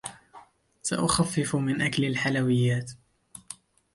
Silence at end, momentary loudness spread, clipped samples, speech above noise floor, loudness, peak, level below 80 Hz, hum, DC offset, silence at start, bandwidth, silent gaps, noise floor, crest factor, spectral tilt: 0.4 s; 18 LU; under 0.1%; 28 dB; -26 LUFS; -10 dBFS; -56 dBFS; none; under 0.1%; 0.05 s; 11.5 kHz; none; -53 dBFS; 18 dB; -5 dB/octave